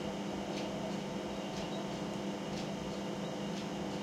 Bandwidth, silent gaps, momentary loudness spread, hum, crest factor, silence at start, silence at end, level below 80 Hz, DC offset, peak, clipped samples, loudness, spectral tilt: 15.5 kHz; none; 1 LU; none; 14 dB; 0 s; 0 s; -62 dBFS; under 0.1%; -26 dBFS; under 0.1%; -39 LUFS; -5 dB/octave